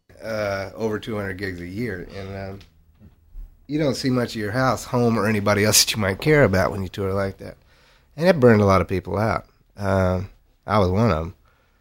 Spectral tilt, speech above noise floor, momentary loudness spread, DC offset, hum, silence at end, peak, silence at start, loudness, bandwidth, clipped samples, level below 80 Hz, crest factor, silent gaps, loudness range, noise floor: -4.5 dB/octave; 34 dB; 17 LU; under 0.1%; none; 0.5 s; -2 dBFS; 0.2 s; -21 LUFS; 16 kHz; under 0.1%; -44 dBFS; 18 dB; none; 10 LU; -55 dBFS